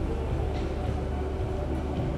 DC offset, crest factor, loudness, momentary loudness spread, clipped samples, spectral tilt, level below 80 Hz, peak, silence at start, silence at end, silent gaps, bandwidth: under 0.1%; 12 dB; -31 LUFS; 1 LU; under 0.1%; -8 dB/octave; -32 dBFS; -18 dBFS; 0 s; 0 s; none; 10 kHz